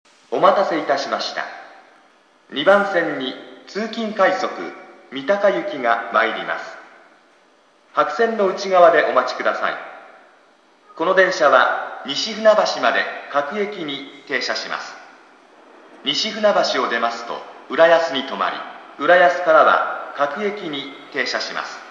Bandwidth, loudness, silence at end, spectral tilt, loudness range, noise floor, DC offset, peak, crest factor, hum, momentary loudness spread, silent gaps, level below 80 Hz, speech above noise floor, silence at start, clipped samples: 7.6 kHz; -18 LUFS; 0 s; -3.5 dB/octave; 5 LU; -55 dBFS; under 0.1%; 0 dBFS; 20 dB; none; 15 LU; none; -82 dBFS; 36 dB; 0.3 s; under 0.1%